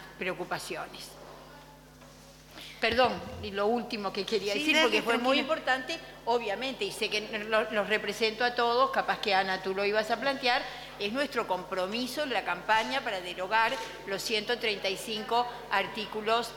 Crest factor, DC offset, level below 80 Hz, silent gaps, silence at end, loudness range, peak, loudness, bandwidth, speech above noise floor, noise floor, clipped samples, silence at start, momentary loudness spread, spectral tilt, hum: 20 dB; under 0.1%; -60 dBFS; none; 0 s; 4 LU; -10 dBFS; -29 LUFS; 18 kHz; 22 dB; -52 dBFS; under 0.1%; 0 s; 10 LU; -3 dB/octave; none